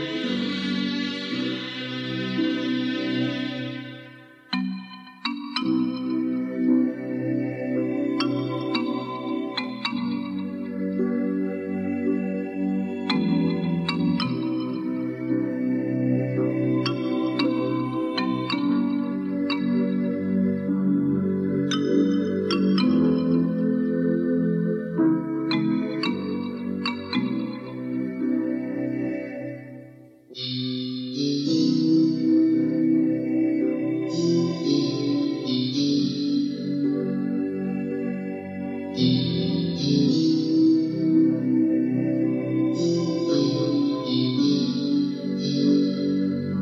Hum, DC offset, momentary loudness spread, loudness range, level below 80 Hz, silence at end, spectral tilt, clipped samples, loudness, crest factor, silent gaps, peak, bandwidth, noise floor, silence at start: none; under 0.1%; 8 LU; 6 LU; -66 dBFS; 0 s; -7 dB/octave; under 0.1%; -24 LUFS; 14 dB; none; -10 dBFS; 7.6 kHz; -47 dBFS; 0 s